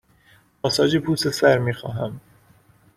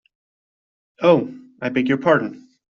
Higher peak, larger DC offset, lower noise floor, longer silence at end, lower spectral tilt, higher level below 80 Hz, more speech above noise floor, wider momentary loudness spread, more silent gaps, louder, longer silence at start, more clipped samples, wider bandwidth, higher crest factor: about the same, -4 dBFS vs -2 dBFS; neither; second, -56 dBFS vs under -90 dBFS; first, 0.75 s vs 0.4 s; about the same, -5 dB/octave vs -5 dB/octave; first, -56 dBFS vs -64 dBFS; second, 36 dB vs over 72 dB; about the same, 12 LU vs 14 LU; neither; about the same, -21 LUFS vs -19 LUFS; second, 0.65 s vs 1 s; neither; first, 15.5 kHz vs 7 kHz; about the same, 20 dB vs 18 dB